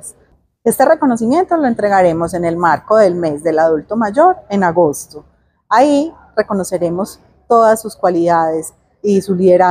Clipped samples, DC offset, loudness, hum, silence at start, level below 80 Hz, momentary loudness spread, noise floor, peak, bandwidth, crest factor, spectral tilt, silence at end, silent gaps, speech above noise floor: under 0.1%; under 0.1%; -14 LUFS; none; 0.05 s; -50 dBFS; 9 LU; -53 dBFS; 0 dBFS; 16 kHz; 14 dB; -6 dB/octave; 0 s; none; 40 dB